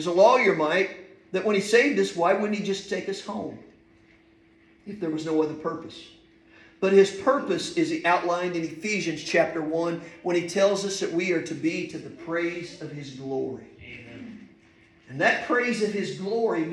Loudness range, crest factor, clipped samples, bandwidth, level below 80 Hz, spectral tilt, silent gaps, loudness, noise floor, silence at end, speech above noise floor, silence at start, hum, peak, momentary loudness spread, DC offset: 9 LU; 18 dB; under 0.1%; 12 kHz; -68 dBFS; -4.5 dB/octave; none; -25 LUFS; -58 dBFS; 0 s; 33 dB; 0 s; none; -6 dBFS; 18 LU; under 0.1%